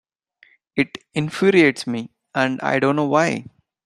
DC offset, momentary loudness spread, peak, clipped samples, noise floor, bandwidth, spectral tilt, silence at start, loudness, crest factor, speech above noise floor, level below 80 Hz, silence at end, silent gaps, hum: under 0.1%; 13 LU; -2 dBFS; under 0.1%; -57 dBFS; 12.5 kHz; -5.5 dB/octave; 0.75 s; -20 LUFS; 18 dB; 37 dB; -62 dBFS; 0.4 s; none; none